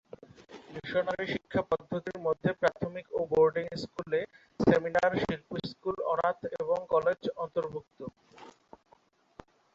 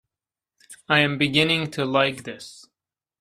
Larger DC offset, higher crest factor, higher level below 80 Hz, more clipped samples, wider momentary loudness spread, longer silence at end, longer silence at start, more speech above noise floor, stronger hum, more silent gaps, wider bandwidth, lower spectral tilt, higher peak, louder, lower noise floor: neither; about the same, 22 dB vs 22 dB; about the same, -62 dBFS vs -62 dBFS; neither; about the same, 18 LU vs 18 LU; first, 1.25 s vs 0.6 s; second, 0.4 s vs 0.7 s; second, 35 dB vs over 68 dB; neither; neither; second, 7.8 kHz vs 14 kHz; first, -7 dB/octave vs -5 dB/octave; second, -8 dBFS vs -2 dBFS; second, -31 LUFS vs -21 LUFS; second, -65 dBFS vs under -90 dBFS